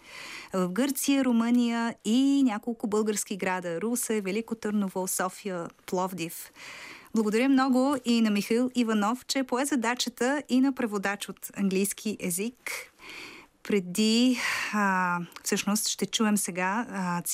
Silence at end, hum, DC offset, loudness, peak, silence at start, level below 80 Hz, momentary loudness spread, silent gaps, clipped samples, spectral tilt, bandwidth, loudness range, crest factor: 0 s; none; under 0.1%; -27 LUFS; -14 dBFS; 0.05 s; -70 dBFS; 12 LU; none; under 0.1%; -4 dB/octave; 16 kHz; 4 LU; 14 dB